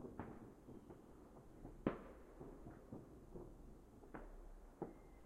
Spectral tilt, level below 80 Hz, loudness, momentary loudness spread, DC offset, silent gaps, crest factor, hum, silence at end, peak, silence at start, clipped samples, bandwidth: -8 dB/octave; -62 dBFS; -55 LUFS; 16 LU; under 0.1%; none; 30 dB; none; 0 s; -24 dBFS; 0 s; under 0.1%; 15 kHz